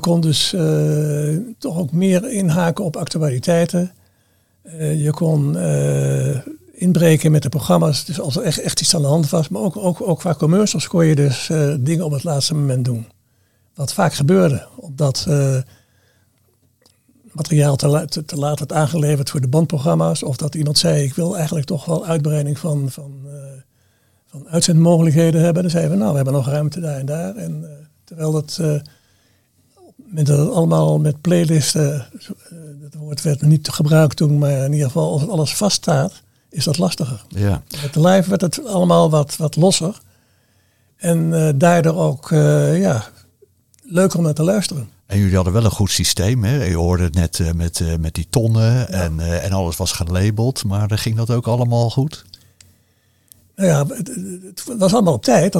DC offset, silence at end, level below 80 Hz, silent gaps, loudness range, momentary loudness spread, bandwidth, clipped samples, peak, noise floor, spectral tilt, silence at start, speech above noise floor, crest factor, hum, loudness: 0.2%; 0 s; -44 dBFS; none; 4 LU; 11 LU; 15.5 kHz; under 0.1%; 0 dBFS; -60 dBFS; -6 dB/octave; 0 s; 43 dB; 18 dB; none; -17 LUFS